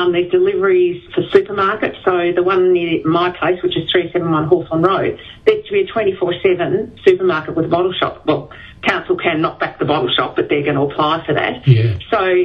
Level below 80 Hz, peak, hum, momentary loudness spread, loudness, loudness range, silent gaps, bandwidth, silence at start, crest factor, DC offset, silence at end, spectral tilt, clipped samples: -48 dBFS; 0 dBFS; none; 5 LU; -16 LUFS; 2 LU; none; 5.8 kHz; 0 s; 16 dB; under 0.1%; 0 s; -8 dB/octave; under 0.1%